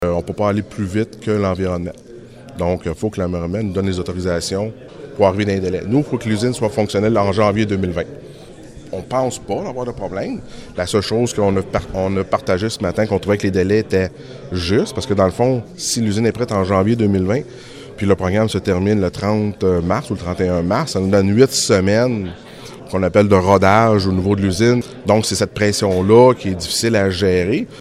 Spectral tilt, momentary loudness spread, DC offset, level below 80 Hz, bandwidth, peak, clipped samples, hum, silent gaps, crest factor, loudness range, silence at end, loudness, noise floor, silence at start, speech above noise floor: -5.5 dB/octave; 12 LU; under 0.1%; -44 dBFS; 16 kHz; 0 dBFS; under 0.1%; none; none; 16 dB; 7 LU; 0 s; -17 LUFS; -37 dBFS; 0 s; 20 dB